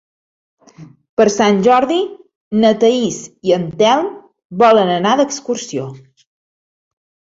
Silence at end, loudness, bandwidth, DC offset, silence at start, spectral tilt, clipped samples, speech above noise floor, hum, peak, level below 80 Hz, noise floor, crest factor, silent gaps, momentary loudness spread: 1.4 s; -15 LUFS; 8 kHz; under 0.1%; 0.8 s; -4.5 dB/octave; under 0.1%; 27 dB; none; 0 dBFS; -58 dBFS; -41 dBFS; 16 dB; 1.09-1.17 s, 2.35-2.51 s, 4.45-4.50 s; 13 LU